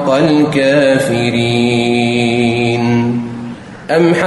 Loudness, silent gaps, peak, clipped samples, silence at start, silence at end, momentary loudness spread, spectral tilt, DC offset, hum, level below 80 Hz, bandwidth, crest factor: -12 LUFS; none; 0 dBFS; under 0.1%; 0 s; 0 s; 10 LU; -6 dB/octave; under 0.1%; none; -48 dBFS; 12 kHz; 12 dB